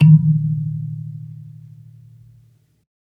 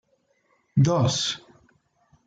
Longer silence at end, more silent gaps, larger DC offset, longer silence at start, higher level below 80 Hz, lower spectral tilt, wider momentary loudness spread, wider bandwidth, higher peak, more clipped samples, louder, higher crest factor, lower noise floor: first, 1.7 s vs 0.9 s; neither; neither; second, 0 s vs 0.75 s; about the same, -60 dBFS vs -60 dBFS; first, -11 dB/octave vs -5 dB/octave; first, 27 LU vs 9 LU; second, 3 kHz vs 9.2 kHz; first, -2 dBFS vs -10 dBFS; neither; first, -18 LUFS vs -23 LUFS; about the same, 18 dB vs 16 dB; second, -54 dBFS vs -68 dBFS